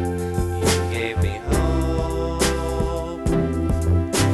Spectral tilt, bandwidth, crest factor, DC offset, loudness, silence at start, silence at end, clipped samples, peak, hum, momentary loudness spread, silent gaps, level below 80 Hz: -5.5 dB/octave; 14 kHz; 16 dB; under 0.1%; -22 LUFS; 0 s; 0 s; under 0.1%; -4 dBFS; none; 4 LU; none; -28 dBFS